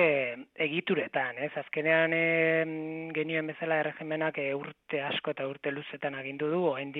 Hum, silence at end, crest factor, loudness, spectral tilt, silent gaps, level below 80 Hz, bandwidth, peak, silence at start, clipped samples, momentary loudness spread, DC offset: none; 0 s; 18 dB; -30 LUFS; -8.5 dB/octave; none; -80 dBFS; 4.2 kHz; -12 dBFS; 0 s; under 0.1%; 10 LU; under 0.1%